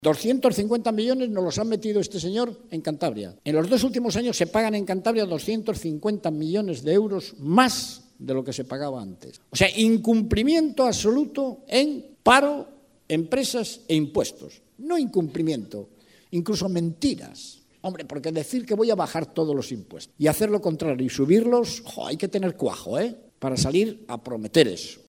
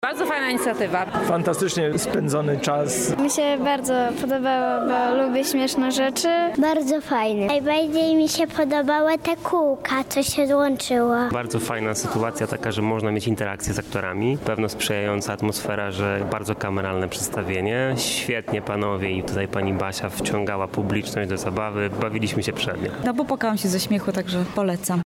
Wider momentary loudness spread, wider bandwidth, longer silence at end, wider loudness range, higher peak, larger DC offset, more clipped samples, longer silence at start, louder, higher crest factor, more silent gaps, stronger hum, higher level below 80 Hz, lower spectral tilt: first, 12 LU vs 5 LU; about the same, 16 kHz vs 16.5 kHz; about the same, 0.15 s vs 0.05 s; about the same, 5 LU vs 4 LU; first, 0 dBFS vs -10 dBFS; neither; neither; about the same, 0 s vs 0 s; about the same, -24 LUFS vs -23 LUFS; first, 24 dB vs 12 dB; neither; neither; about the same, -52 dBFS vs -52 dBFS; about the same, -5 dB/octave vs -4.5 dB/octave